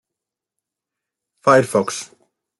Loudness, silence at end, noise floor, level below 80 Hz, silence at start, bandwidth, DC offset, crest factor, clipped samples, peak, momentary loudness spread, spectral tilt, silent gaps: -17 LUFS; 0.55 s; -85 dBFS; -66 dBFS; 1.45 s; 12 kHz; under 0.1%; 20 dB; under 0.1%; -2 dBFS; 16 LU; -4.5 dB/octave; none